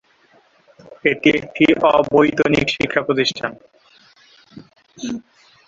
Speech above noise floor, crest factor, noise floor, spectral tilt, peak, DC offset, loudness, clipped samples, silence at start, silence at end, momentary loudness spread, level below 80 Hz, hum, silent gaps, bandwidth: 38 dB; 18 dB; -55 dBFS; -5 dB/octave; -2 dBFS; under 0.1%; -17 LUFS; under 0.1%; 0.9 s; 0.45 s; 15 LU; -50 dBFS; none; none; 7.6 kHz